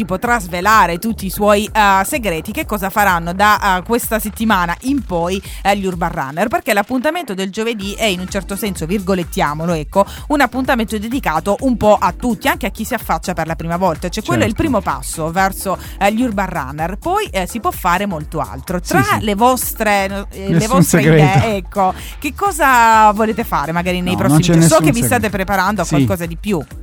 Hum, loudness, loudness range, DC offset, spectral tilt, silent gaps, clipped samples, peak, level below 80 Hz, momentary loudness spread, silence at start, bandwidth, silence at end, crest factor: none; -15 LUFS; 6 LU; under 0.1%; -5 dB/octave; none; under 0.1%; 0 dBFS; -32 dBFS; 10 LU; 0 s; over 20 kHz; 0 s; 16 dB